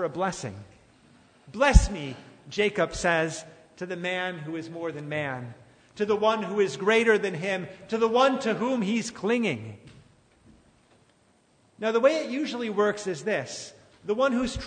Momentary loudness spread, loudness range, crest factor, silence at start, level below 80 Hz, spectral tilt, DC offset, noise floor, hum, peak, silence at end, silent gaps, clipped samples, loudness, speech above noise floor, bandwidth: 17 LU; 6 LU; 24 dB; 0 s; -36 dBFS; -5 dB/octave; under 0.1%; -63 dBFS; none; -2 dBFS; 0 s; none; under 0.1%; -26 LUFS; 38 dB; 9.6 kHz